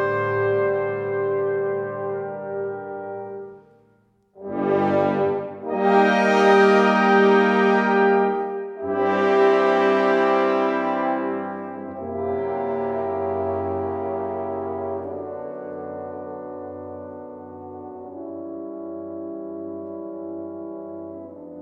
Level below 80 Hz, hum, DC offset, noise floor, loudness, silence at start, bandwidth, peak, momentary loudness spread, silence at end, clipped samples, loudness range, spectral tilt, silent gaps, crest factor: -66 dBFS; none; under 0.1%; -61 dBFS; -21 LUFS; 0 s; 7.8 kHz; -4 dBFS; 19 LU; 0 s; under 0.1%; 17 LU; -6.5 dB/octave; none; 18 dB